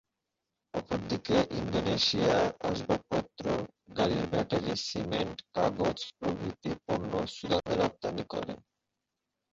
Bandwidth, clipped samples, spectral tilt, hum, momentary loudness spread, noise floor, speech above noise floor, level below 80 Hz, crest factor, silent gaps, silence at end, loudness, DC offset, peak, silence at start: 7.8 kHz; under 0.1%; -5.5 dB/octave; none; 10 LU; -86 dBFS; 55 dB; -54 dBFS; 18 dB; none; 0.95 s; -32 LUFS; under 0.1%; -14 dBFS; 0.75 s